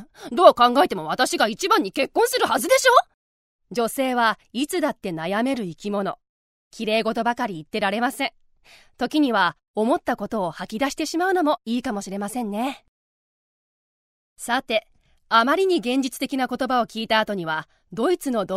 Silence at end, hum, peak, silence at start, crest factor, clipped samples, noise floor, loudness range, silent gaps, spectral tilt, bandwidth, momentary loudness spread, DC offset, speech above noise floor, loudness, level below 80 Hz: 0 s; none; 0 dBFS; 0 s; 22 dB; under 0.1%; under -90 dBFS; 6 LU; 3.14-3.59 s, 6.29-6.71 s, 9.68-9.74 s, 12.88-14.36 s; -3.5 dB/octave; 16 kHz; 11 LU; under 0.1%; over 68 dB; -22 LUFS; -60 dBFS